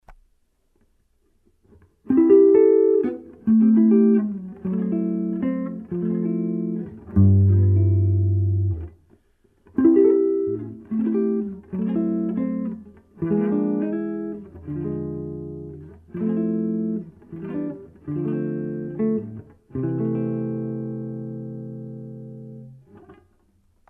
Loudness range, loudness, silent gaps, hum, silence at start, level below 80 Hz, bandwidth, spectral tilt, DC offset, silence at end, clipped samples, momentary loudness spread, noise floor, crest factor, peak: 11 LU; -22 LUFS; none; none; 0.1 s; -52 dBFS; 2.9 kHz; -13.5 dB/octave; under 0.1%; 0.75 s; under 0.1%; 20 LU; -64 dBFS; 16 dB; -6 dBFS